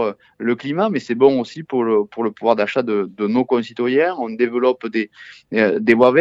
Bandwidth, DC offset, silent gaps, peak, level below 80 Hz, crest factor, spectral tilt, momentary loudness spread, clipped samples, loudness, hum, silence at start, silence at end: 7.8 kHz; under 0.1%; none; 0 dBFS; -66 dBFS; 18 dB; -7 dB/octave; 8 LU; under 0.1%; -19 LUFS; none; 0 s; 0 s